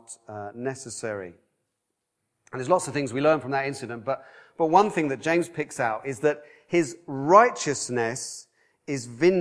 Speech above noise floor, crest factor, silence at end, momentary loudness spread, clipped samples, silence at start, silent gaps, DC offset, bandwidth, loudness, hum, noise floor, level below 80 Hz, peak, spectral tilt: 55 dB; 24 dB; 0 s; 16 LU; under 0.1%; 0.1 s; none; under 0.1%; 11 kHz; -25 LUFS; none; -80 dBFS; -70 dBFS; -2 dBFS; -5 dB/octave